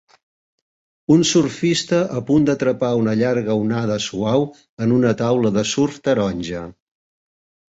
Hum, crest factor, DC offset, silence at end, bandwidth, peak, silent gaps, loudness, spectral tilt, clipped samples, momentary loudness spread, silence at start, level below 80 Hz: none; 16 dB; under 0.1%; 1.05 s; 8 kHz; -2 dBFS; 4.69-4.77 s; -19 LUFS; -5.5 dB/octave; under 0.1%; 8 LU; 1.1 s; -52 dBFS